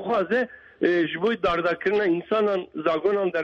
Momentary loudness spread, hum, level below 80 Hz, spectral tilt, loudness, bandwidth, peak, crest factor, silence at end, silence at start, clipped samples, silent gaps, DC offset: 4 LU; none; -56 dBFS; -7 dB/octave; -24 LUFS; 7.2 kHz; -8 dBFS; 16 dB; 0 s; 0 s; under 0.1%; none; under 0.1%